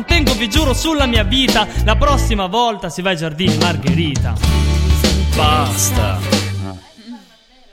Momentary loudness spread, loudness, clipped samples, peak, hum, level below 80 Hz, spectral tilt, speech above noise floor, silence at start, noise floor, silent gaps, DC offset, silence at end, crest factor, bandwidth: 5 LU; -15 LUFS; under 0.1%; 0 dBFS; none; -20 dBFS; -4.5 dB/octave; 32 dB; 0 s; -47 dBFS; none; under 0.1%; 0.55 s; 16 dB; 16.5 kHz